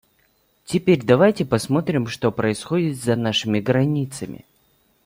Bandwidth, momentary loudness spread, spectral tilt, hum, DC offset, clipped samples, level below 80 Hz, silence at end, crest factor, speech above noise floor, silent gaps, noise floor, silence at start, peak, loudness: 16.5 kHz; 10 LU; -6 dB/octave; none; under 0.1%; under 0.1%; -56 dBFS; 0.7 s; 18 dB; 43 dB; none; -63 dBFS; 0.7 s; -2 dBFS; -20 LUFS